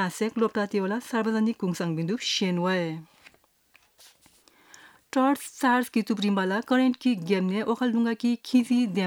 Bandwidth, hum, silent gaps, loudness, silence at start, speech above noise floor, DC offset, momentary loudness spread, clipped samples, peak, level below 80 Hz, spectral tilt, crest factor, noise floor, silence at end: 17.5 kHz; none; none; -26 LUFS; 0 s; 38 dB; under 0.1%; 5 LU; under 0.1%; -10 dBFS; -76 dBFS; -5.5 dB/octave; 16 dB; -63 dBFS; 0 s